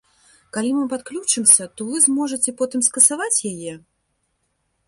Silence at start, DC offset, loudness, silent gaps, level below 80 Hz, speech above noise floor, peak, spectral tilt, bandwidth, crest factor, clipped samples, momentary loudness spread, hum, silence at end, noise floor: 0.55 s; under 0.1%; -17 LUFS; none; -68 dBFS; 51 dB; 0 dBFS; -2 dB/octave; 12 kHz; 22 dB; under 0.1%; 15 LU; none; 1.1 s; -71 dBFS